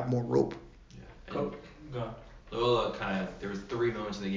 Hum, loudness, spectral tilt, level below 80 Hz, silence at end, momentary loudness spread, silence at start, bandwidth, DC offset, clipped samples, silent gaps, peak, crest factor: none; -33 LUFS; -6.5 dB/octave; -54 dBFS; 0 s; 21 LU; 0 s; 7.6 kHz; under 0.1%; under 0.1%; none; -14 dBFS; 18 dB